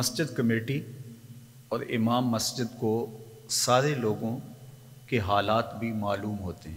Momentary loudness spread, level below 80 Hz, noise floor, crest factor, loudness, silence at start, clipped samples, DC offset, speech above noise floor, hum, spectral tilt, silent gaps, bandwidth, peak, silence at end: 22 LU; -60 dBFS; -49 dBFS; 20 dB; -28 LUFS; 0 s; under 0.1%; under 0.1%; 21 dB; none; -4.5 dB/octave; none; 16 kHz; -8 dBFS; 0 s